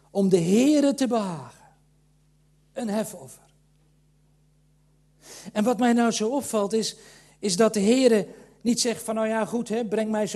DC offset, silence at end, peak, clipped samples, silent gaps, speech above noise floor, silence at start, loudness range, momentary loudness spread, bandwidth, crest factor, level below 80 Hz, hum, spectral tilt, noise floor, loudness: under 0.1%; 0 s; -6 dBFS; under 0.1%; none; 39 dB; 0.15 s; 14 LU; 15 LU; 13 kHz; 18 dB; -66 dBFS; none; -4.5 dB/octave; -62 dBFS; -24 LUFS